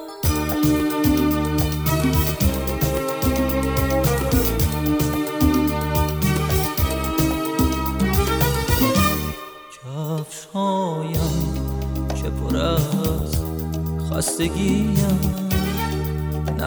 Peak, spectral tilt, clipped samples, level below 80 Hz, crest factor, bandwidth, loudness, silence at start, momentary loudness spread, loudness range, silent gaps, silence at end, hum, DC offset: -4 dBFS; -5.5 dB/octave; under 0.1%; -28 dBFS; 16 dB; over 20 kHz; -21 LUFS; 0 s; 7 LU; 3 LU; none; 0 s; none; under 0.1%